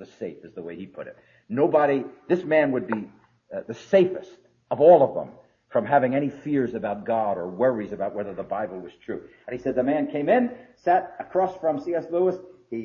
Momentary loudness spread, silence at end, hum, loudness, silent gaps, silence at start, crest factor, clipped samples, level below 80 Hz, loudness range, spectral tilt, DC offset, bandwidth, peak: 17 LU; 0 s; none; -24 LUFS; none; 0 s; 20 dB; under 0.1%; -66 dBFS; 5 LU; -8 dB/octave; under 0.1%; 7 kHz; -4 dBFS